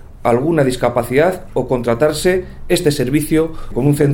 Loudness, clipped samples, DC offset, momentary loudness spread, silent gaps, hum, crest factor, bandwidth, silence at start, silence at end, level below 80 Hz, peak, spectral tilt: -16 LUFS; under 0.1%; under 0.1%; 5 LU; none; none; 14 dB; 17.5 kHz; 0.05 s; 0 s; -32 dBFS; 0 dBFS; -6 dB/octave